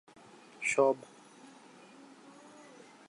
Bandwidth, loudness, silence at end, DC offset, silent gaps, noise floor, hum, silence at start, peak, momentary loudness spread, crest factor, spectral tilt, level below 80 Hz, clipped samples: 11.5 kHz; -31 LUFS; 2.05 s; under 0.1%; none; -57 dBFS; none; 0.6 s; -14 dBFS; 27 LU; 22 dB; -3.5 dB/octave; -88 dBFS; under 0.1%